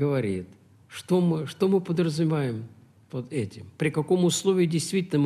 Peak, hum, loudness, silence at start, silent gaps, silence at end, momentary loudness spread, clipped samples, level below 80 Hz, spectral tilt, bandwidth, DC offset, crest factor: -10 dBFS; none; -26 LUFS; 0 s; none; 0 s; 15 LU; under 0.1%; -68 dBFS; -6 dB/octave; 14.5 kHz; under 0.1%; 14 dB